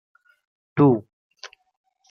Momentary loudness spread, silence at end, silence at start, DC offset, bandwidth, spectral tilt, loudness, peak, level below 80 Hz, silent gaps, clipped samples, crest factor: 24 LU; 0.65 s; 0.75 s; under 0.1%; 6.6 kHz; -9 dB/octave; -20 LUFS; -6 dBFS; -70 dBFS; 1.13-1.30 s; under 0.1%; 20 dB